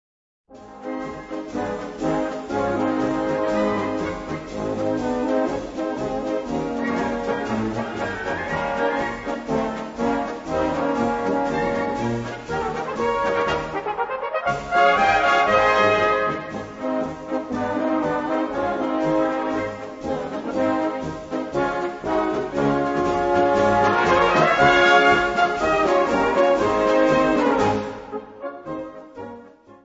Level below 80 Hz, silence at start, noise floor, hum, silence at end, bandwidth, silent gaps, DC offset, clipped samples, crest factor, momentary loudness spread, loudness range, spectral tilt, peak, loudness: -46 dBFS; 0.5 s; -45 dBFS; none; 0.1 s; 8 kHz; none; under 0.1%; under 0.1%; 18 dB; 13 LU; 8 LU; -5.5 dB/octave; -2 dBFS; -22 LUFS